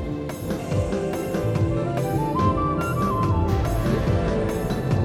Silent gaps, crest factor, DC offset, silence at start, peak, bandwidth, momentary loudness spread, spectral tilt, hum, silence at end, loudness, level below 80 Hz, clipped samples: none; 14 dB; under 0.1%; 0 s; -10 dBFS; 16.5 kHz; 4 LU; -7.5 dB/octave; none; 0 s; -24 LUFS; -32 dBFS; under 0.1%